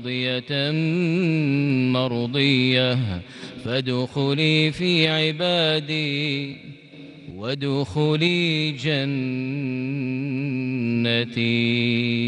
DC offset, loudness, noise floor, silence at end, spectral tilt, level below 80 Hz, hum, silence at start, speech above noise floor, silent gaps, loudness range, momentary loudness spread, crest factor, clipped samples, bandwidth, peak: under 0.1%; -22 LUFS; -43 dBFS; 0 s; -6.5 dB/octave; -60 dBFS; none; 0 s; 20 dB; none; 3 LU; 10 LU; 16 dB; under 0.1%; 10 kHz; -6 dBFS